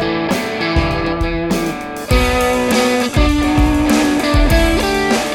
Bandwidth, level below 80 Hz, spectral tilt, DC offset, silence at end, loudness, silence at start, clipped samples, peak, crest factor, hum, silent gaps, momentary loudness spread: 18.5 kHz; -20 dBFS; -5 dB/octave; under 0.1%; 0 s; -15 LUFS; 0 s; under 0.1%; 0 dBFS; 14 dB; none; none; 5 LU